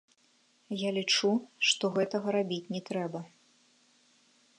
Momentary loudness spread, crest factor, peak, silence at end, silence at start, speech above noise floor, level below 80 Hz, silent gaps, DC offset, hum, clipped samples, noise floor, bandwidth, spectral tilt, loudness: 12 LU; 20 dB; -12 dBFS; 1.3 s; 0.7 s; 37 dB; -84 dBFS; none; under 0.1%; none; under 0.1%; -68 dBFS; 11.5 kHz; -3.5 dB/octave; -30 LUFS